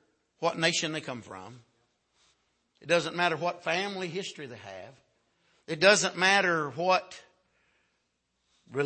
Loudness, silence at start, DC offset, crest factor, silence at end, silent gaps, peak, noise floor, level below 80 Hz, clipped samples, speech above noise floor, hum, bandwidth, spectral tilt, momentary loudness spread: -27 LUFS; 0.4 s; under 0.1%; 22 dB; 0 s; none; -8 dBFS; -78 dBFS; -78 dBFS; under 0.1%; 49 dB; none; 8.8 kHz; -3 dB/octave; 22 LU